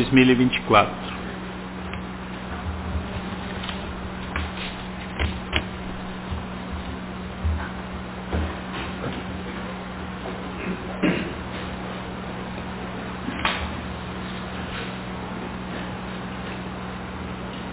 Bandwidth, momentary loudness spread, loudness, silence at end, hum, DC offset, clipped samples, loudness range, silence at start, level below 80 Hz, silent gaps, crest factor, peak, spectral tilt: 4 kHz; 9 LU; -28 LUFS; 0 s; none; under 0.1%; under 0.1%; 5 LU; 0 s; -38 dBFS; none; 24 dB; -2 dBFS; -10 dB/octave